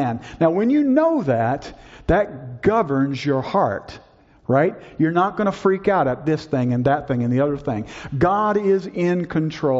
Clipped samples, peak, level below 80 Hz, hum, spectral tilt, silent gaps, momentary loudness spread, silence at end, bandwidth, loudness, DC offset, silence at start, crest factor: under 0.1%; -4 dBFS; -44 dBFS; none; -6.5 dB/octave; none; 9 LU; 0 s; 7.8 kHz; -20 LUFS; under 0.1%; 0 s; 16 dB